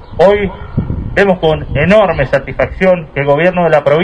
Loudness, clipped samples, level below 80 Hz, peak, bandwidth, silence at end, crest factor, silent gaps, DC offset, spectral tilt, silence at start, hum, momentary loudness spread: -12 LUFS; 0.4%; -28 dBFS; 0 dBFS; 9.6 kHz; 0 s; 12 dB; none; under 0.1%; -7.5 dB/octave; 0 s; none; 8 LU